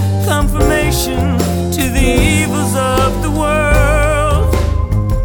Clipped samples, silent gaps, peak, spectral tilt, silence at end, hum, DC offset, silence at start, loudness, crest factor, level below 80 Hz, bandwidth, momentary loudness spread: under 0.1%; none; 0 dBFS; -5.5 dB/octave; 0 s; none; under 0.1%; 0 s; -14 LUFS; 12 dB; -18 dBFS; 18 kHz; 4 LU